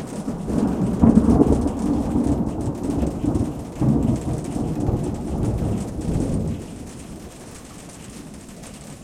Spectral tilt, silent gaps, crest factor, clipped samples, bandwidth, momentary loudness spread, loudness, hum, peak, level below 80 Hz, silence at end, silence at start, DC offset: -8 dB/octave; none; 22 dB; under 0.1%; 14.5 kHz; 21 LU; -22 LUFS; none; 0 dBFS; -32 dBFS; 0 s; 0 s; under 0.1%